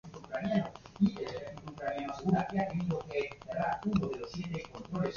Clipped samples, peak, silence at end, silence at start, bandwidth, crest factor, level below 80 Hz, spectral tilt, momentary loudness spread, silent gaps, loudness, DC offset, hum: under 0.1%; -16 dBFS; 0 s; 0.05 s; 7.2 kHz; 18 dB; -58 dBFS; -7.5 dB/octave; 9 LU; none; -35 LUFS; under 0.1%; none